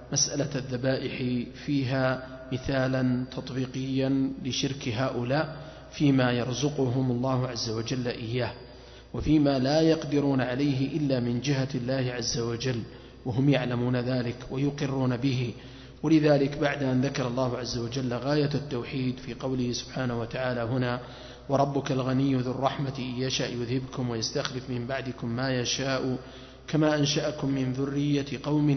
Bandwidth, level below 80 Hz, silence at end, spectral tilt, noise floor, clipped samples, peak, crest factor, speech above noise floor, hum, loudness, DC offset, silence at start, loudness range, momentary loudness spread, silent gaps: 6.4 kHz; -52 dBFS; 0 s; -5.5 dB/octave; -47 dBFS; under 0.1%; -8 dBFS; 18 dB; 20 dB; none; -28 LUFS; under 0.1%; 0 s; 3 LU; 9 LU; none